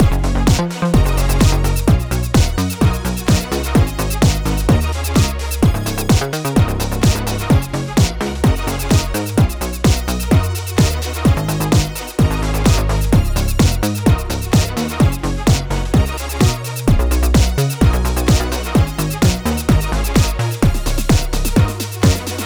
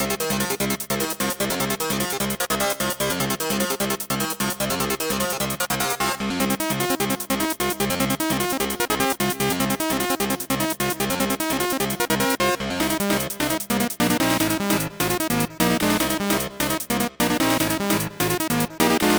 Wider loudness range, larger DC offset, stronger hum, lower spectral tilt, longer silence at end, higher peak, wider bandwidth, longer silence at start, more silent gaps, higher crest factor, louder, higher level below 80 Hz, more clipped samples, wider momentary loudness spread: about the same, 1 LU vs 2 LU; neither; neither; first, -5.5 dB/octave vs -3.5 dB/octave; about the same, 0 s vs 0 s; first, -2 dBFS vs -6 dBFS; about the same, over 20 kHz vs over 20 kHz; about the same, 0 s vs 0 s; neither; about the same, 14 dB vs 18 dB; first, -16 LUFS vs -22 LUFS; first, -20 dBFS vs -46 dBFS; neither; about the same, 3 LU vs 3 LU